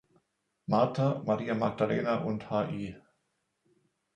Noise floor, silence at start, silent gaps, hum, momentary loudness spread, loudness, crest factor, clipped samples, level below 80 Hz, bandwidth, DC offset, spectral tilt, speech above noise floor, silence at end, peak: -79 dBFS; 0.7 s; none; none; 9 LU; -30 LUFS; 20 dB; under 0.1%; -66 dBFS; 9.4 kHz; under 0.1%; -8 dB/octave; 49 dB; 1.15 s; -12 dBFS